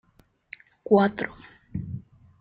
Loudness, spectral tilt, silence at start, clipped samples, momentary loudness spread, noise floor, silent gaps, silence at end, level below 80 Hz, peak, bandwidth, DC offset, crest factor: -25 LUFS; -10 dB/octave; 0.9 s; under 0.1%; 25 LU; -62 dBFS; none; 0.4 s; -56 dBFS; -6 dBFS; 5 kHz; under 0.1%; 22 dB